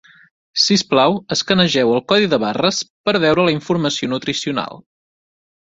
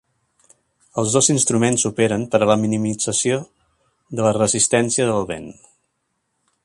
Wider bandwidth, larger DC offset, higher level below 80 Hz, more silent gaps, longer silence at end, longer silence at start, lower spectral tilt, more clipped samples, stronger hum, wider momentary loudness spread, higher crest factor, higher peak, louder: second, 8 kHz vs 11.5 kHz; neither; about the same, -56 dBFS vs -54 dBFS; first, 2.90-3.04 s vs none; second, 0.95 s vs 1.15 s; second, 0.55 s vs 0.95 s; about the same, -4 dB/octave vs -4 dB/octave; neither; neither; second, 7 LU vs 12 LU; about the same, 16 dB vs 18 dB; about the same, -2 dBFS vs -2 dBFS; about the same, -16 LUFS vs -18 LUFS